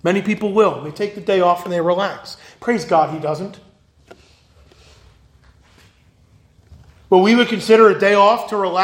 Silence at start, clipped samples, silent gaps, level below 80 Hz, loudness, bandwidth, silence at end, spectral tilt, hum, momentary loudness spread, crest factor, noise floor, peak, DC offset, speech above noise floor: 0.05 s; under 0.1%; none; -56 dBFS; -16 LUFS; 16.5 kHz; 0 s; -5.5 dB/octave; none; 14 LU; 18 dB; -52 dBFS; 0 dBFS; under 0.1%; 37 dB